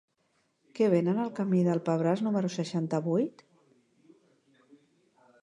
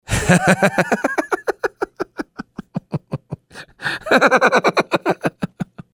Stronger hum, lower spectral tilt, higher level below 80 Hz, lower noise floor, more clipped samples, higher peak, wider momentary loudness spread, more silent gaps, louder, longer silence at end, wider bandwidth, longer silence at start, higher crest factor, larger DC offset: neither; first, -7.5 dB/octave vs -5 dB/octave; second, -80 dBFS vs -42 dBFS; first, -73 dBFS vs -39 dBFS; neither; second, -12 dBFS vs 0 dBFS; second, 6 LU vs 18 LU; neither; second, -29 LUFS vs -18 LUFS; first, 2.1 s vs 0.1 s; second, 10 kHz vs 20 kHz; first, 0.75 s vs 0.1 s; about the same, 18 dB vs 20 dB; neither